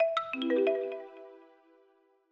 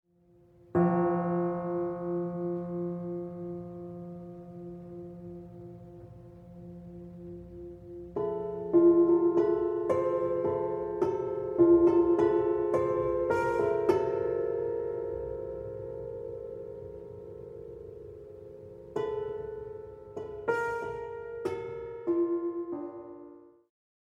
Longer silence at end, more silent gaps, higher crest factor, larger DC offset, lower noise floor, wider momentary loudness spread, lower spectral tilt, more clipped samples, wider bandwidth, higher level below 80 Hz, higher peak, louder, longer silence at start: first, 0.95 s vs 0.55 s; neither; about the same, 16 dB vs 20 dB; neither; first, -67 dBFS vs -62 dBFS; about the same, 22 LU vs 21 LU; second, -4.5 dB/octave vs -9.5 dB/octave; neither; about the same, 7.2 kHz vs 6.8 kHz; second, -84 dBFS vs -58 dBFS; second, -16 dBFS vs -12 dBFS; about the same, -31 LUFS vs -30 LUFS; second, 0 s vs 0.75 s